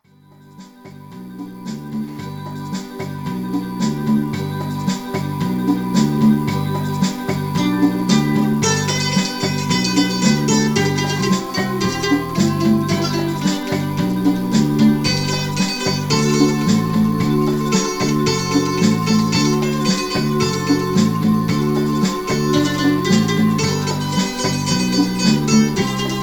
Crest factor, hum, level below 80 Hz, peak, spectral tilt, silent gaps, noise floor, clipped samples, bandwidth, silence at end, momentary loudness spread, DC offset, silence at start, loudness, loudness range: 16 dB; none; -44 dBFS; -2 dBFS; -5 dB/octave; none; -47 dBFS; under 0.1%; 19 kHz; 0 s; 8 LU; under 0.1%; 0.6 s; -18 LUFS; 6 LU